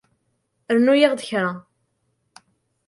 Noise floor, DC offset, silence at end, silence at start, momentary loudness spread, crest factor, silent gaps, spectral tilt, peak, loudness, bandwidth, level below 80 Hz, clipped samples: -71 dBFS; under 0.1%; 1.25 s; 0.7 s; 11 LU; 20 dB; none; -5 dB/octave; -2 dBFS; -19 LUFS; 11.5 kHz; -72 dBFS; under 0.1%